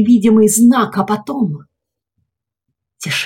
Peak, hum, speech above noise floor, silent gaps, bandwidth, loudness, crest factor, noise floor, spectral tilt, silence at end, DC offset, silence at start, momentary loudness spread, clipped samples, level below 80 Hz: -2 dBFS; none; 60 dB; none; 17 kHz; -13 LUFS; 12 dB; -72 dBFS; -4.5 dB/octave; 0 s; under 0.1%; 0 s; 13 LU; under 0.1%; -58 dBFS